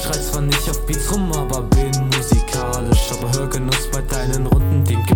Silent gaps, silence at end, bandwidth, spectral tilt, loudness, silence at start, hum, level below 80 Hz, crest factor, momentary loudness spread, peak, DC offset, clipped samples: none; 0 s; 18 kHz; -4.5 dB/octave; -19 LUFS; 0 s; none; -22 dBFS; 14 dB; 5 LU; -4 dBFS; under 0.1%; under 0.1%